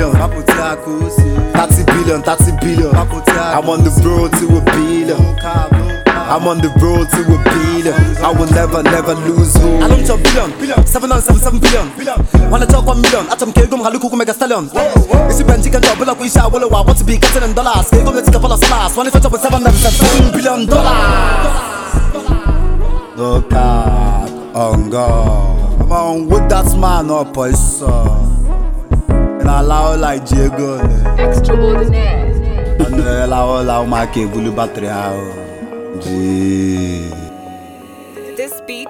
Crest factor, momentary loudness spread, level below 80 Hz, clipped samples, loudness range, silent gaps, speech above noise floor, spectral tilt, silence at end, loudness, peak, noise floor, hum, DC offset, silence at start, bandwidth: 10 dB; 8 LU; -14 dBFS; under 0.1%; 5 LU; none; 23 dB; -5.5 dB/octave; 0 s; -12 LUFS; 0 dBFS; -33 dBFS; none; under 0.1%; 0 s; 19 kHz